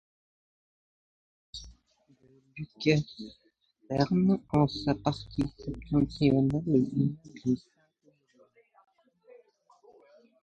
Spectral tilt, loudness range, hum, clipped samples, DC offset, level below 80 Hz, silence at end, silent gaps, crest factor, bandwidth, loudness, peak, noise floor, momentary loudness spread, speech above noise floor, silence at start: -7.5 dB/octave; 8 LU; none; under 0.1%; under 0.1%; -54 dBFS; 2.85 s; none; 22 dB; 8.6 kHz; -29 LUFS; -10 dBFS; -68 dBFS; 20 LU; 40 dB; 1.55 s